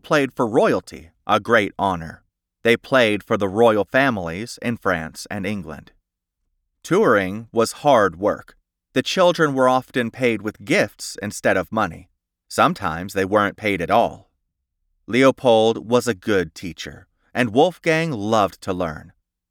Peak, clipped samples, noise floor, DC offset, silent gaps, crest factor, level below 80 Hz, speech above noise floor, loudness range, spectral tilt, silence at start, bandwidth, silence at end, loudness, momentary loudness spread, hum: -2 dBFS; under 0.1%; -77 dBFS; under 0.1%; none; 18 dB; -54 dBFS; 57 dB; 3 LU; -5 dB/octave; 0.05 s; 18 kHz; 0.5 s; -20 LUFS; 13 LU; none